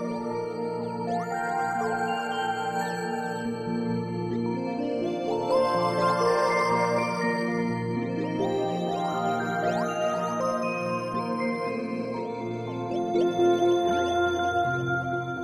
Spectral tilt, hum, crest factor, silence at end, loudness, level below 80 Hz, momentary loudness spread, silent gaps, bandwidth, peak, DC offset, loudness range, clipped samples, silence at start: -6 dB/octave; none; 16 dB; 0 s; -27 LUFS; -62 dBFS; 8 LU; none; 14.5 kHz; -12 dBFS; under 0.1%; 4 LU; under 0.1%; 0 s